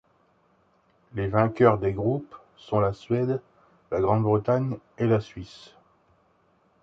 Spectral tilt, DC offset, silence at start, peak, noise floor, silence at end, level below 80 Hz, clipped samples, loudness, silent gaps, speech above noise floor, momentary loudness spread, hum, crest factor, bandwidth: -9 dB/octave; under 0.1%; 1.15 s; -4 dBFS; -65 dBFS; 1.25 s; -52 dBFS; under 0.1%; -25 LUFS; none; 40 dB; 16 LU; none; 22 dB; 7.6 kHz